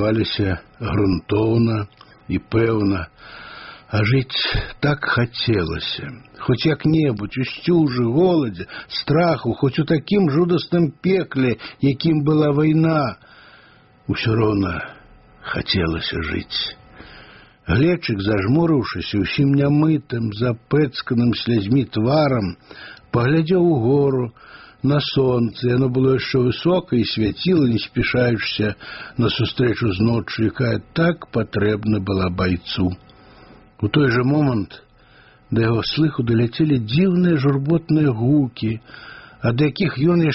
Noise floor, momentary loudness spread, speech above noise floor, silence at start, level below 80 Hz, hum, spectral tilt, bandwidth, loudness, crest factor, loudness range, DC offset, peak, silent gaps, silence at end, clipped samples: -50 dBFS; 10 LU; 32 dB; 0 s; -42 dBFS; none; -6 dB/octave; 6 kHz; -19 LUFS; 14 dB; 3 LU; under 0.1%; -4 dBFS; none; 0 s; under 0.1%